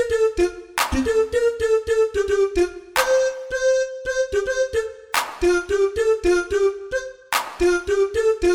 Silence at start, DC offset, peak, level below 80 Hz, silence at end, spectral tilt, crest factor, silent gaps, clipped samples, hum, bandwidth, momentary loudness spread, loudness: 0 s; under 0.1%; -6 dBFS; -40 dBFS; 0 s; -3.5 dB/octave; 16 dB; none; under 0.1%; none; 16 kHz; 5 LU; -21 LUFS